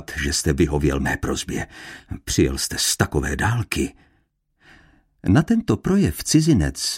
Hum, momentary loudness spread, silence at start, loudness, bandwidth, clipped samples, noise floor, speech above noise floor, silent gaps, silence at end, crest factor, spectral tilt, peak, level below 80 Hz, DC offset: none; 11 LU; 0 s; -21 LUFS; 16.5 kHz; under 0.1%; -66 dBFS; 45 dB; none; 0 s; 20 dB; -4.5 dB/octave; -2 dBFS; -34 dBFS; under 0.1%